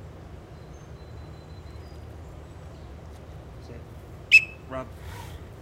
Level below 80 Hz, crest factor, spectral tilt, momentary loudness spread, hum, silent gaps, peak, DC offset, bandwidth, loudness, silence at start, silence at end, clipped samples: -46 dBFS; 26 dB; -3.5 dB/octave; 28 LU; none; none; -4 dBFS; under 0.1%; 16 kHz; -20 LUFS; 0 s; 0 s; under 0.1%